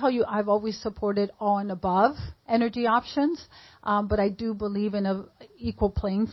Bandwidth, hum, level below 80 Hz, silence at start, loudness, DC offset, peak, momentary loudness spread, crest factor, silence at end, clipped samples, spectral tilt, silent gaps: 6 kHz; none; -44 dBFS; 0 s; -26 LUFS; under 0.1%; -6 dBFS; 9 LU; 20 dB; 0 s; under 0.1%; -7.5 dB/octave; none